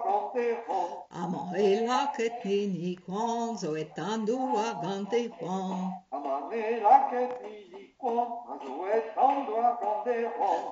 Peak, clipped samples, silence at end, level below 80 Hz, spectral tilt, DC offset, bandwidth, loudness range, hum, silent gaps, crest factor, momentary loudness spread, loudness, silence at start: -8 dBFS; under 0.1%; 0 s; -78 dBFS; -5.5 dB/octave; under 0.1%; 7.8 kHz; 4 LU; none; none; 20 dB; 10 LU; -30 LUFS; 0 s